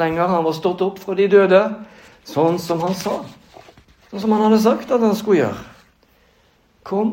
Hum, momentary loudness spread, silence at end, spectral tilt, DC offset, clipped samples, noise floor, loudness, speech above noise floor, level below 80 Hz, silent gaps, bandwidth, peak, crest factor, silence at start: none; 12 LU; 0 s; -6.5 dB/octave; under 0.1%; under 0.1%; -57 dBFS; -18 LUFS; 40 dB; -58 dBFS; none; 16.5 kHz; 0 dBFS; 18 dB; 0 s